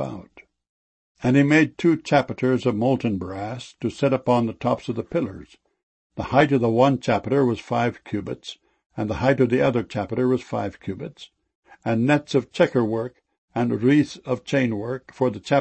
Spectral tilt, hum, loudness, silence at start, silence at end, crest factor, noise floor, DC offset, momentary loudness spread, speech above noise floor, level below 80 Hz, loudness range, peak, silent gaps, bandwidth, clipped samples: -7 dB/octave; none; -22 LUFS; 0 s; 0 s; 20 dB; -50 dBFS; under 0.1%; 14 LU; 28 dB; -54 dBFS; 3 LU; -2 dBFS; 0.69-1.15 s, 5.83-6.10 s, 8.86-8.90 s, 11.55-11.63 s, 13.38-13.48 s; 8.6 kHz; under 0.1%